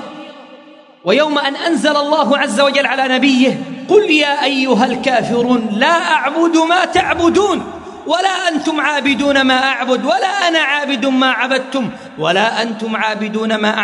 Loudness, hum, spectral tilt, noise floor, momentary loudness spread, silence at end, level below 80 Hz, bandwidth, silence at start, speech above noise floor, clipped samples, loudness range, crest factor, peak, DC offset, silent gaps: -14 LUFS; none; -3.5 dB/octave; -41 dBFS; 7 LU; 0 s; -54 dBFS; 11 kHz; 0 s; 27 dB; under 0.1%; 2 LU; 14 dB; 0 dBFS; under 0.1%; none